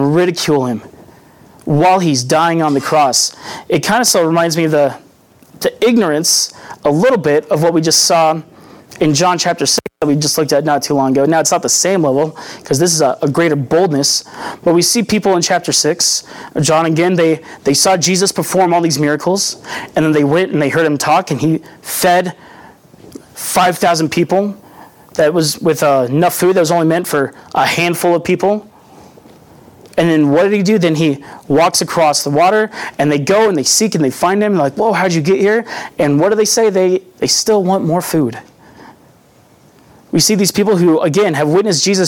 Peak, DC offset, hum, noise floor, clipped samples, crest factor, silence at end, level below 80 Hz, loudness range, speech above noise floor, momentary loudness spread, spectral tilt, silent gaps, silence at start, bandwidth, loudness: -2 dBFS; under 0.1%; none; -47 dBFS; under 0.1%; 12 dB; 0 s; -54 dBFS; 3 LU; 34 dB; 7 LU; -4 dB/octave; none; 0 s; 19 kHz; -13 LUFS